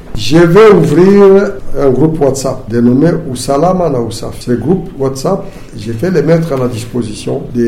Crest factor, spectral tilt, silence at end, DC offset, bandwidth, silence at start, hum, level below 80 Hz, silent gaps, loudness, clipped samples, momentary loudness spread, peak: 10 dB; -6.5 dB/octave; 0 s; under 0.1%; 15.5 kHz; 0 s; none; -28 dBFS; none; -10 LUFS; 2%; 14 LU; 0 dBFS